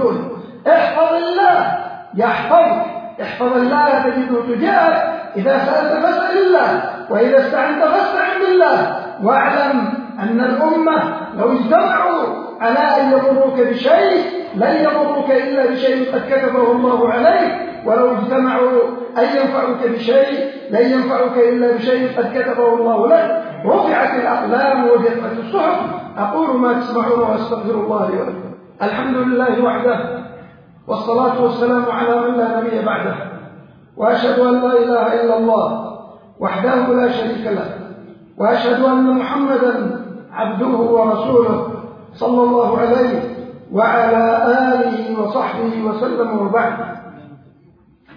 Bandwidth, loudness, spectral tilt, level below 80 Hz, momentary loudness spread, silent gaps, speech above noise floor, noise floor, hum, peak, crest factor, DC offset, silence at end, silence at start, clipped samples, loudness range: 5.2 kHz; -15 LUFS; -8 dB/octave; -60 dBFS; 10 LU; none; 35 dB; -50 dBFS; none; 0 dBFS; 14 dB; under 0.1%; 0.8 s; 0 s; under 0.1%; 3 LU